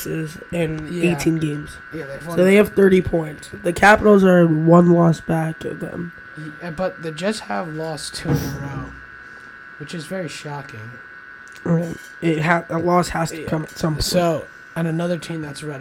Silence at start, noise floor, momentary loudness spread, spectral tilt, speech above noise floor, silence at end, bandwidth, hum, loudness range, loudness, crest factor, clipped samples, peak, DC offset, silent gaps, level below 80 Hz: 0 s; -40 dBFS; 22 LU; -6.5 dB/octave; 21 dB; 0 s; 17 kHz; none; 13 LU; -19 LUFS; 20 dB; under 0.1%; 0 dBFS; under 0.1%; none; -44 dBFS